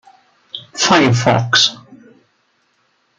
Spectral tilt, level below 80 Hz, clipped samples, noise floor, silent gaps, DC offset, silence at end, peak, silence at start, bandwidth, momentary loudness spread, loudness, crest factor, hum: -3.5 dB/octave; -56 dBFS; under 0.1%; -62 dBFS; none; under 0.1%; 1.25 s; 0 dBFS; 0.55 s; 9.4 kHz; 19 LU; -13 LUFS; 18 dB; none